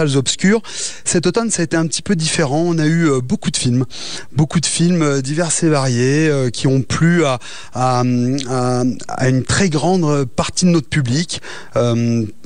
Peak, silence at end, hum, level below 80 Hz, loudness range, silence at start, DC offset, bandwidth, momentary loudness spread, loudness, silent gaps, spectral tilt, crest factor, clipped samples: -4 dBFS; 0.15 s; none; -46 dBFS; 1 LU; 0 s; 3%; 10 kHz; 5 LU; -16 LUFS; none; -5 dB/octave; 12 dB; under 0.1%